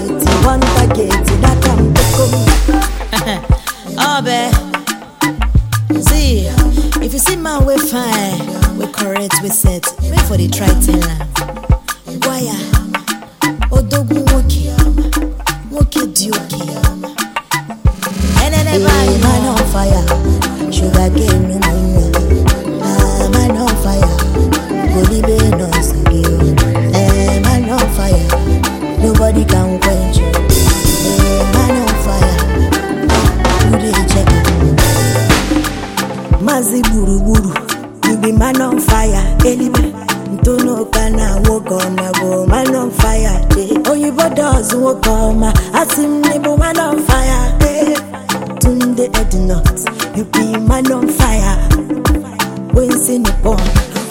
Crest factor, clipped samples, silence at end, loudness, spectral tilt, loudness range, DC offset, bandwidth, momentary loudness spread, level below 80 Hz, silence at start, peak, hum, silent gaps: 12 dB; under 0.1%; 0 s; -13 LUFS; -5 dB/octave; 3 LU; under 0.1%; 17 kHz; 6 LU; -16 dBFS; 0 s; 0 dBFS; none; none